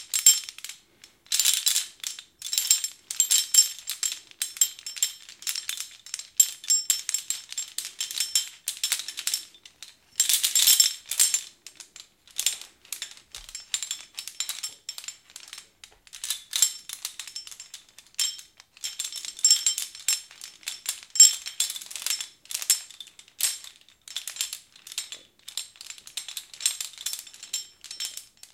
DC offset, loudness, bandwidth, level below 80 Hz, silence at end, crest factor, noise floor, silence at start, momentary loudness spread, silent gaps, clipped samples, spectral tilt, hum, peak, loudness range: under 0.1%; -24 LUFS; 17 kHz; -72 dBFS; 0.3 s; 26 dB; -56 dBFS; 0 s; 21 LU; none; under 0.1%; 5.5 dB/octave; none; -2 dBFS; 10 LU